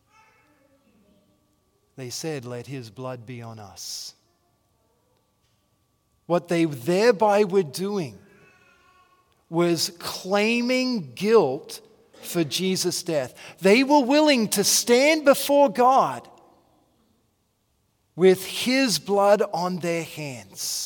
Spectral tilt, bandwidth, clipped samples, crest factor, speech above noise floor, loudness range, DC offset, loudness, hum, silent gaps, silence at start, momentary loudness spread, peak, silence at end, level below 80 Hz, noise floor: -4 dB/octave; 18 kHz; under 0.1%; 20 dB; 47 dB; 17 LU; under 0.1%; -22 LUFS; none; none; 2 s; 18 LU; -4 dBFS; 0 s; -74 dBFS; -69 dBFS